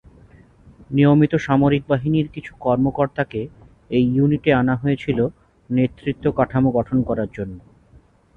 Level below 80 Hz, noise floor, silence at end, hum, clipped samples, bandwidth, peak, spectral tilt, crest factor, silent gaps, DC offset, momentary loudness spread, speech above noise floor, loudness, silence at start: -46 dBFS; -52 dBFS; 0.8 s; none; under 0.1%; 6.8 kHz; -4 dBFS; -9 dB/octave; 16 dB; none; under 0.1%; 9 LU; 33 dB; -20 LUFS; 0.8 s